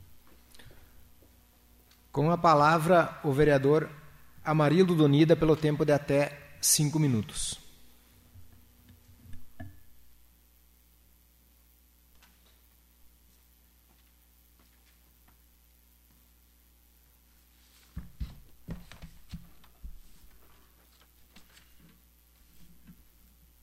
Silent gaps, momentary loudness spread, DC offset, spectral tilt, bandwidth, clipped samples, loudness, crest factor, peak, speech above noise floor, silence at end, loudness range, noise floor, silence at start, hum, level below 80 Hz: none; 27 LU; under 0.1%; -5 dB/octave; 16 kHz; under 0.1%; -25 LUFS; 22 dB; -10 dBFS; 38 dB; 1 s; 24 LU; -62 dBFS; 0.55 s; none; -54 dBFS